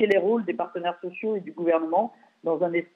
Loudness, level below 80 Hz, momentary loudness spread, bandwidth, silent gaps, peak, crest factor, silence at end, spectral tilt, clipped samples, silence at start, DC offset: -26 LUFS; -78 dBFS; 9 LU; 6.2 kHz; none; -10 dBFS; 16 dB; 0.1 s; -7.5 dB/octave; under 0.1%; 0 s; under 0.1%